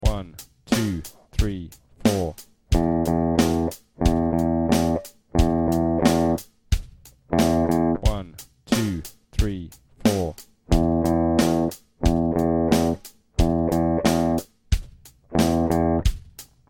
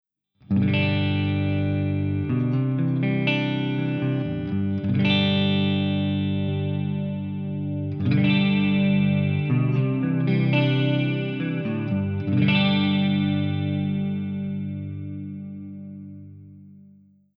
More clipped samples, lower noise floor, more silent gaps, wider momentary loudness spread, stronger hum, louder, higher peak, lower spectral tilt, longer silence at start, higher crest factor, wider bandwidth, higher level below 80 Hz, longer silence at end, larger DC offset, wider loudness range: neither; second, -47 dBFS vs -53 dBFS; neither; about the same, 12 LU vs 10 LU; second, none vs 50 Hz at -50 dBFS; about the same, -23 LUFS vs -23 LUFS; about the same, -4 dBFS vs -6 dBFS; second, -6.5 dB/octave vs -9 dB/octave; second, 0 s vs 0.5 s; about the same, 18 dB vs 16 dB; first, 17.5 kHz vs 5.4 kHz; first, -30 dBFS vs -56 dBFS; second, 0.25 s vs 0.65 s; neither; about the same, 3 LU vs 5 LU